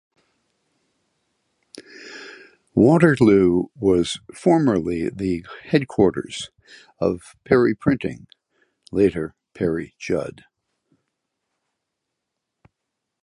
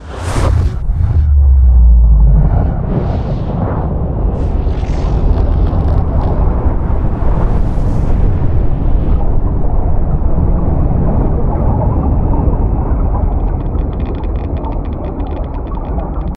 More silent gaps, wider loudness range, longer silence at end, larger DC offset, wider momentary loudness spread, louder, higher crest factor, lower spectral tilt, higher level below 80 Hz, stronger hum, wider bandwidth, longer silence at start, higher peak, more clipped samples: neither; first, 11 LU vs 5 LU; first, 2.95 s vs 0 s; neither; first, 21 LU vs 9 LU; second, -20 LUFS vs -15 LUFS; first, 20 dB vs 10 dB; second, -7 dB/octave vs -9 dB/octave; second, -50 dBFS vs -12 dBFS; neither; first, 11 kHz vs 8.8 kHz; first, 1.75 s vs 0 s; about the same, -2 dBFS vs 0 dBFS; neither